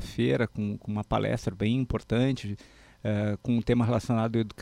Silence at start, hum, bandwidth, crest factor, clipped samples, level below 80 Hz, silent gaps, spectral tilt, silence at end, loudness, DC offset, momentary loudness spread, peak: 0 s; none; 12.5 kHz; 16 dB; under 0.1%; -46 dBFS; none; -7.5 dB/octave; 0 s; -28 LUFS; under 0.1%; 8 LU; -12 dBFS